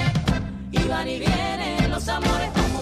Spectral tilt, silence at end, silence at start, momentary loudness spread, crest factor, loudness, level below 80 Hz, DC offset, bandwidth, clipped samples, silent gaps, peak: -5.5 dB/octave; 0 s; 0 s; 3 LU; 14 dB; -24 LUFS; -30 dBFS; under 0.1%; 15.5 kHz; under 0.1%; none; -8 dBFS